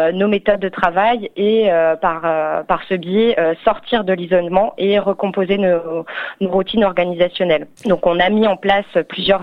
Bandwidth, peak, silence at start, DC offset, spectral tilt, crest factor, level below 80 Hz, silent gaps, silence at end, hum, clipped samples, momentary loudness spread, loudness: 6.8 kHz; 0 dBFS; 0 s; under 0.1%; -7.5 dB/octave; 16 dB; -46 dBFS; none; 0 s; none; under 0.1%; 5 LU; -16 LUFS